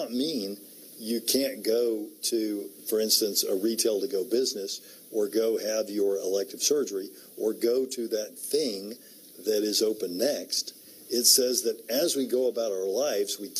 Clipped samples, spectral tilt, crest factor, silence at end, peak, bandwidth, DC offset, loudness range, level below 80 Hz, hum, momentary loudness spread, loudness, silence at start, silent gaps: under 0.1%; -2 dB/octave; 22 dB; 0 s; -6 dBFS; 15.5 kHz; under 0.1%; 4 LU; -90 dBFS; none; 12 LU; -27 LUFS; 0 s; none